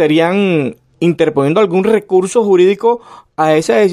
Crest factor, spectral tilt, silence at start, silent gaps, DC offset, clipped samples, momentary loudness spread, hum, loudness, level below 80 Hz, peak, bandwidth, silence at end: 12 dB; -6 dB/octave; 0 s; none; under 0.1%; under 0.1%; 7 LU; none; -13 LUFS; -56 dBFS; 0 dBFS; 13.5 kHz; 0 s